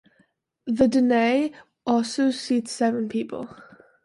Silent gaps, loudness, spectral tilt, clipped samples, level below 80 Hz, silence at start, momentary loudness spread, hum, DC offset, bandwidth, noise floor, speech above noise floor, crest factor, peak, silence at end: none; -23 LUFS; -4.5 dB/octave; under 0.1%; -62 dBFS; 0.65 s; 14 LU; none; under 0.1%; 11.5 kHz; -66 dBFS; 43 dB; 16 dB; -8 dBFS; 0.4 s